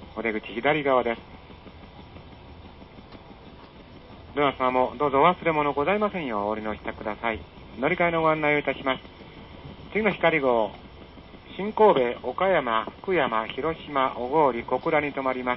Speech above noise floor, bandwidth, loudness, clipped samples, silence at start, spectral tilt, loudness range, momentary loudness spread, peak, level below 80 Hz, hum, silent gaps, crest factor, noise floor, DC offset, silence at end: 22 dB; 5.8 kHz; -25 LUFS; under 0.1%; 0 s; -10 dB/octave; 6 LU; 24 LU; -6 dBFS; -52 dBFS; none; none; 20 dB; -46 dBFS; under 0.1%; 0 s